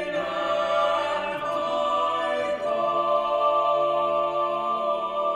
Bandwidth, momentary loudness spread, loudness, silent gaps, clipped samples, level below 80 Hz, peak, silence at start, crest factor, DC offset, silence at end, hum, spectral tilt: 10.5 kHz; 5 LU; -24 LUFS; none; under 0.1%; -62 dBFS; -12 dBFS; 0 s; 14 dB; under 0.1%; 0 s; none; -4 dB/octave